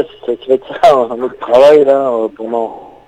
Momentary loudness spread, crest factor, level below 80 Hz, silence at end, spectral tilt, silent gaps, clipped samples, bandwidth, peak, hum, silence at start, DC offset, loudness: 13 LU; 12 dB; -52 dBFS; 0.2 s; -5.5 dB/octave; none; 1%; 10.5 kHz; 0 dBFS; none; 0 s; under 0.1%; -11 LUFS